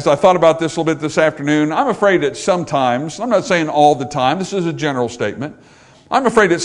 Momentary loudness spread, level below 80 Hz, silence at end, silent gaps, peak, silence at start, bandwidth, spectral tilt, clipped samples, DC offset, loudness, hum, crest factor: 8 LU; -52 dBFS; 0 s; none; 0 dBFS; 0 s; 11 kHz; -5 dB/octave; under 0.1%; under 0.1%; -16 LUFS; none; 16 dB